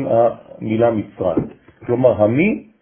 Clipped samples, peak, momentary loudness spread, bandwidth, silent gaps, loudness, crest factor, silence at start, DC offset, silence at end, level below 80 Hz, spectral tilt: under 0.1%; -2 dBFS; 13 LU; 3.5 kHz; none; -18 LUFS; 16 dB; 0 s; under 0.1%; 0.2 s; -48 dBFS; -13 dB/octave